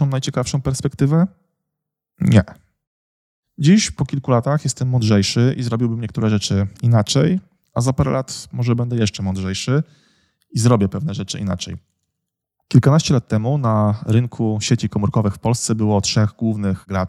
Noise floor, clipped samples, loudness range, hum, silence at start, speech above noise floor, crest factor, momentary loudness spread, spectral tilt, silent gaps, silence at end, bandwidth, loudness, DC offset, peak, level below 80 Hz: -81 dBFS; under 0.1%; 3 LU; none; 0 s; 63 dB; 18 dB; 8 LU; -6 dB/octave; 2.87-3.43 s; 0 s; 12.5 kHz; -18 LUFS; under 0.1%; 0 dBFS; -46 dBFS